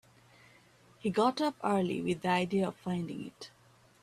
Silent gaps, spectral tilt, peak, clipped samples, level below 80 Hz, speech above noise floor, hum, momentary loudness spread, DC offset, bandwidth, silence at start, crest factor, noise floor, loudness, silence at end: none; -6 dB/octave; -14 dBFS; under 0.1%; -70 dBFS; 30 dB; none; 14 LU; under 0.1%; 13 kHz; 1.05 s; 20 dB; -62 dBFS; -32 LUFS; 0.55 s